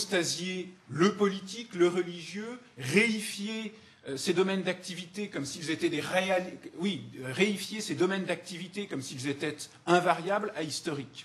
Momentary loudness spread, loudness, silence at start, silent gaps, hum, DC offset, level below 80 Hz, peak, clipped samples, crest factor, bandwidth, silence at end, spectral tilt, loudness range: 13 LU; -31 LUFS; 0 s; none; none; under 0.1%; -76 dBFS; -8 dBFS; under 0.1%; 22 dB; 13 kHz; 0 s; -4.5 dB/octave; 2 LU